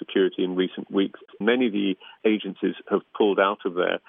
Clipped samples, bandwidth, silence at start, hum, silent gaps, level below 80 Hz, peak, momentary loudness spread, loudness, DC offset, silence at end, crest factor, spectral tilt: under 0.1%; 3.8 kHz; 0 s; none; none; -82 dBFS; -6 dBFS; 6 LU; -25 LUFS; under 0.1%; 0.1 s; 18 dB; -3.5 dB/octave